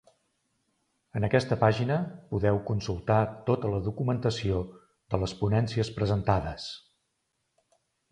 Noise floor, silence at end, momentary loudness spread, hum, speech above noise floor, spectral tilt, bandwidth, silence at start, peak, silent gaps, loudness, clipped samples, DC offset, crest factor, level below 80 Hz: -78 dBFS; 1.3 s; 9 LU; none; 51 dB; -7 dB/octave; 10 kHz; 1.15 s; -8 dBFS; none; -29 LUFS; under 0.1%; under 0.1%; 22 dB; -48 dBFS